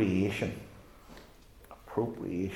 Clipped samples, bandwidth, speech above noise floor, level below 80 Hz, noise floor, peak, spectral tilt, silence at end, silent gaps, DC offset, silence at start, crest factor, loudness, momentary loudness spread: under 0.1%; 16 kHz; 23 dB; -58 dBFS; -55 dBFS; -16 dBFS; -7 dB/octave; 0 s; none; under 0.1%; 0 s; 18 dB; -34 LUFS; 23 LU